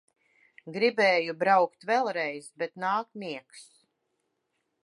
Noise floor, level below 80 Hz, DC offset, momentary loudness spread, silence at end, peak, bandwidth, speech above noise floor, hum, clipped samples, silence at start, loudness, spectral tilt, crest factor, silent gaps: -79 dBFS; -86 dBFS; under 0.1%; 15 LU; 1.25 s; -10 dBFS; 11.5 kHz; 51 dB; none; under 0.1%; 0.65 s; -27 LUFS; -4.5 dB/octave; 20 dB; none